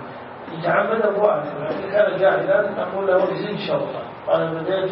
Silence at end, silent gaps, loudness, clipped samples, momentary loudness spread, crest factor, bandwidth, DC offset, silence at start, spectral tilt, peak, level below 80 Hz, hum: 0 s; none; -21 LUFS; under 0.1%; 10 LU; 18 dB; 5.8 kHz; under 0.1%; 0 s; -10.5 dB/octave; -2 dBFS; -64 dBFS; none